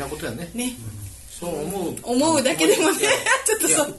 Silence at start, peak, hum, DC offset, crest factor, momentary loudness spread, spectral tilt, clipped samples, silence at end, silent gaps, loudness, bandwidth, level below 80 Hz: 0 s; -6 dBFS; none; under 0.1%; 16 dB; 16 LU; -2.5 dB/octave; under 0.1%; 0 s; none; -21 LUFS; 12.5 kHz; -48 dBFS